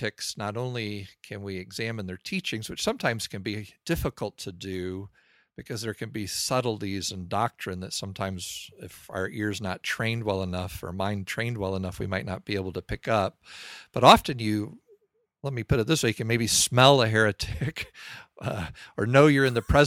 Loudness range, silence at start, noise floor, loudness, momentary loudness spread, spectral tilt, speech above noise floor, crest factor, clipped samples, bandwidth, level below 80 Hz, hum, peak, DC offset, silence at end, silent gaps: 9 LU; 0 s; -64 dBFS; -27 LUFS; 17 LU; -4.5 dB/octave; 37 dB; 26 dB; under 0.1%; 16.5 kHz; -48 dBFS; none; -2 dBFS; under 0.1%; 0 s; none